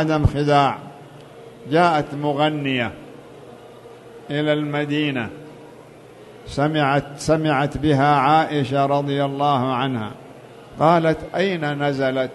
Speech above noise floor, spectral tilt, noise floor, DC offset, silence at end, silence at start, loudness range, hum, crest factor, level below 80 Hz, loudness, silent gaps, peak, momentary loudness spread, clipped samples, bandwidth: 24 dB; -6.5 dB/octave; -43 dBFS; under 0.1%; 0 s; 0 s; 6 LU; none; 18 dB; -42 dBFS; -20 LUFS; none; -2 dBFS; 17 LU; under 0.1%; 12.5 kHz